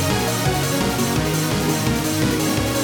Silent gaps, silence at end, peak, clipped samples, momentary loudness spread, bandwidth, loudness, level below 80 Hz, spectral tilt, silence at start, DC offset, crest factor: none; 0 s; -8 dBFS; under 0.1%; 1 LU; 19.5 kHz; -20 LUFS; -36 dBFS; -4.5 dB/octave; 0 s; under 0.1%; 12 dB